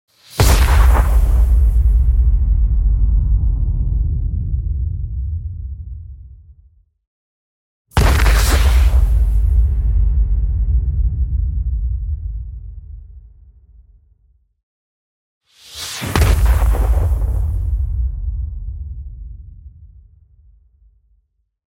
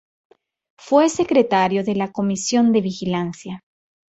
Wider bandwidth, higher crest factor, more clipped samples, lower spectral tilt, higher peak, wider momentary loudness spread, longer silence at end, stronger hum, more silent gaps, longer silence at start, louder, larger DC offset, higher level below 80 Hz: first, 16.5 kHz vs 8.2 kHz; about the same, 16 dB vs 18 dB; neither; about the same, -5.5 dB/octave vs -5 dB/octave; about the same, 0 dBFS vs -2 dBFS; first, 18 LU vs 13 LU; first, 1.8 s vs 0.55 s; neither; first, 7.07-7.85 s, 14.63-15.41 s vs none; second, 0.3 s vs 0.85 s; about the same, -18 LUFS vs -19 LUFS; neither; first, -16 dBFS vs -60 dBFS